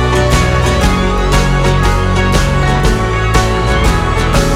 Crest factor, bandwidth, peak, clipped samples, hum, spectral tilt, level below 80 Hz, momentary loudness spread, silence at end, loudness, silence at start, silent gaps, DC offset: 10 dB; 15.5 kHz; 0 dBFS; under 0.1%; none; -5 dB/octave; -16 dBFS; 2 LU; 0 s; -12 LUFS; 0 s; none; under 0.1%